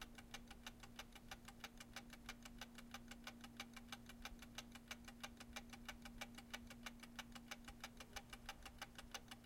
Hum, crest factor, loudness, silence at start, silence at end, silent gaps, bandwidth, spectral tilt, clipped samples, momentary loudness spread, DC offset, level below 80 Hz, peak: none; 24 dB; -56 LUFS; 0 s; 0 s; none; 16.5 kHz; -2.5 dB/octave; under 0.1%; 3 LU; under 0.1%; -66 dBFS; -34 dBFS